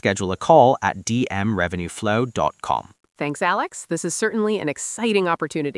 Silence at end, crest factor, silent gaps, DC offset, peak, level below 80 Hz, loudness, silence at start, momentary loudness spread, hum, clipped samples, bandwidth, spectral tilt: 0 s; 20 dB; none; under 0.1%; 0 dBFS; -56 dBFS; -21 LUFS; 0.05 s; 11 LU; none; under 0.1%; 12 kHz; -4.5 dB/octave